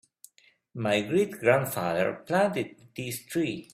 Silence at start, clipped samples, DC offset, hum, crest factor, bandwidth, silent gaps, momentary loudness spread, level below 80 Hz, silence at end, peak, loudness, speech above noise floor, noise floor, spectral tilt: 0.75 s; under 0.1%; under 0.1%; none; 22 dB; 16 kHz; none; 12 LU; -66 dBFS; 0.1 s; -8 dBFS; -28 LUFS; 35 dB; -63 dBFS; -5 dB/octave